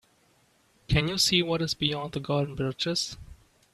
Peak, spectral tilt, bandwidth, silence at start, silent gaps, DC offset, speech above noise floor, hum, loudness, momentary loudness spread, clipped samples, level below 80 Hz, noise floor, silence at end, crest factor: -10 dBFS; -4 dB/octave; 13.5 kHz; 0.9 s; none; under 0.1%; 37 dB; none; -27 LUFS; 10 LU; under 0.1%; -46 dBFS; -65 dBFS; 0.4 s; 20 dB